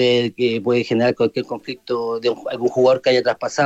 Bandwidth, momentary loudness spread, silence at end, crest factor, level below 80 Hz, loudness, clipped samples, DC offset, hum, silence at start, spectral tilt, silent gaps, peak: 8.2 kHz; 9 LU; 0 s; 14 dB; -64 dBFS; -19 LUFS; under 0.1%; under 0.1%; none; 0 s; -5.5 dB/octave; none; -4 dBFS